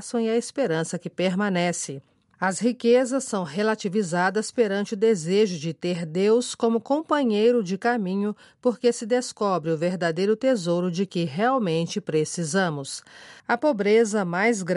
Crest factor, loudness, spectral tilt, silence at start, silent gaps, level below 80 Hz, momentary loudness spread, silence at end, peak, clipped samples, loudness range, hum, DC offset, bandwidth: 16 dB; -24 LUFS; -5 dB/octave; 0 s; none; -74 dBFS; 8 LU; 0 s; -8 dBFS; under 0.1%; 2 LU; none; under 0.1%; 11.5 kHz